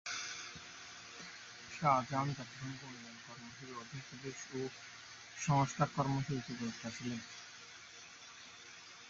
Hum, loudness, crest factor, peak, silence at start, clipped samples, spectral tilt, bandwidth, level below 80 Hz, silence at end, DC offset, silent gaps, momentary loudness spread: none; -40 LUFS; 24 dB; -16 dBFS; 0.05 s; under 0.1%; -4.5 dB/octave; 7.6 kHz; -70 dBFS; 0 s; under 0.1%; none; 18 LU